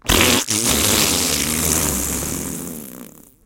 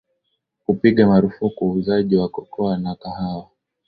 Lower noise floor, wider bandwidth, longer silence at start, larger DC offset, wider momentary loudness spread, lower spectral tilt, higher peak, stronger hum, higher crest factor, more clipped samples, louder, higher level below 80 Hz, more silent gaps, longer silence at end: second, -40 dBFS vs -73 dBFS; first, 17 kHz vs 4.9 kHz; second, 0.05 s vs 0.7 s; neither; about the same, 15 LU vs 13 LU; second, -2 dB/octave vs -11 dB/octave; about the same, 0 dBFS vs -2 dBFS; neither; about the same, 20 dB vs 18 dB; neither; first, -16 LUFS vs -19 LUFS; first, -34 dBFS vs -50 dBFS; neither; about the same, 0.35 s vs 0.45 s